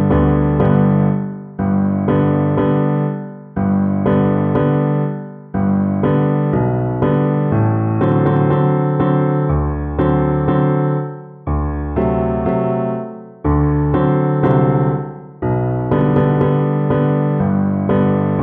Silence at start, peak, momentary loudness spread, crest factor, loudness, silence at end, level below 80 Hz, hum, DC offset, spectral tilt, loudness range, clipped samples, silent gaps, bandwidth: 0 s; -2 dBFS; 8 LU; 14 dB; -16 LUFS; 0 s; -30 dBFS; none; under 0.1%; -12.5 dB/octave; 2 LU; under 0.1%; none; 3.7 kHz